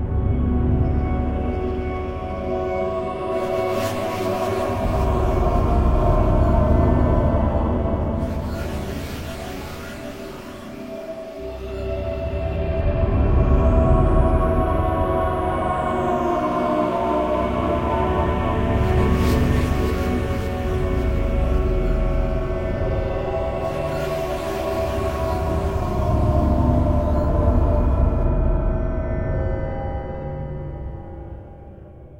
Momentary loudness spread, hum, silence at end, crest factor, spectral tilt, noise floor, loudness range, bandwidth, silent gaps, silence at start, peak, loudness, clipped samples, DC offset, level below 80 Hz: 13 LU; none; 0 s; 16 dB; -8 dB/octave; -40 dBFS; 8 LU; 16.5 kHz; none; 0 s; -4 dBFS; -22 LUFS; under 0.1%; under 0.1%; -24 dBFS